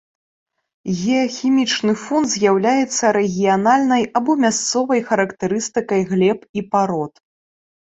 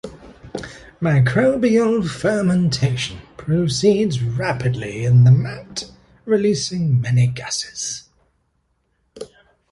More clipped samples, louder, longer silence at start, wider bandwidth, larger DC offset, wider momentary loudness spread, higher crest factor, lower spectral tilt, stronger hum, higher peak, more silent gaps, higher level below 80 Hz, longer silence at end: neither; about the same, -18 LUFS vs -18 LUFS; first, 0.85 s vs 0.05 s; second, 8.4 kHz vs 11.5 kHz; neither; second, 7 LU vs 18 LU; about the same, 16 dB vs 16 dB; second, -4.5 dB/octave vs -6 dB/octave; neither; about the same, -2 dBFS vs -4 dBFS; first, 6.49-6.54 s vs none; second, -60 dBFS vs -48 dBFS; first, 0.8 s vs 0.45 s